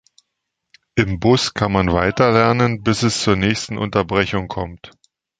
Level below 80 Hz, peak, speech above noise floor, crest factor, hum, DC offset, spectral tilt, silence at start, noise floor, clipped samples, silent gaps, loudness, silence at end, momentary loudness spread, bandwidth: -38 dBFS; 0 dBFS; 60 dB; 18 dB; none; under 0.1%; -5.5 dB/octave; 0.95 s; -77 dBFS; under 0.1%; none; -18 LUFS; 0.5 s; 9 LU; 9.4 kHz